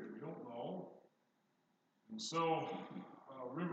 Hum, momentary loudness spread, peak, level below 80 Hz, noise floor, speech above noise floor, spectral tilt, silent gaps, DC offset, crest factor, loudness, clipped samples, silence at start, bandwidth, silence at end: none; 16 LU; -26 dBFS; under -90 dBFS; -80 dBFS; 39 dB; -5 dB/octave; none; under 0.1%; 20 dB; -44 LUFS; under 0.1%; 0 s; 8.8 kHz; 0 s